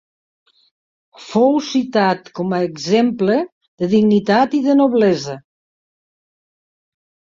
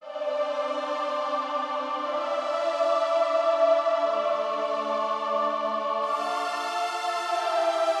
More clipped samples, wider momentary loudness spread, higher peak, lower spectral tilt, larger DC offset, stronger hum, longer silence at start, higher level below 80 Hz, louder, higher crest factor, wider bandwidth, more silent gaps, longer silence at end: neither; first, 9 LU vs 6 LU; first, -2 dBFS vs -10 dBFS; first, -6 dB/octave vs -2 dB/octave; neither; neither; first, 1.2 s vs 0 s; first, -60 dBFS vs under -90 dBFS; first, -16 LUFS vs -26 LUFS; about the same, 16 dB vs 16 dB; second, 7.6 kHz vs 12.5 kHz; first, 3.52-3.61 s, 3.68-3.78 s vs none; first, 2 s vs 0 s